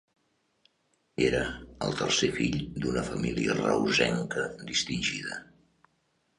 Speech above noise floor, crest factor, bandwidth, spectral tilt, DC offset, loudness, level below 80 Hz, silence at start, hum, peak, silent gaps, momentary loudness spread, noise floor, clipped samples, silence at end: 44 dB; 20 dB; 11 kHz; -4 dB/octave; under 0.1%; -29 LUFS; -52 dBFS; 1.2 s; none; -10 dBFS; none; 10 LU; -73 dBFS; under 0.1%; 0.95 s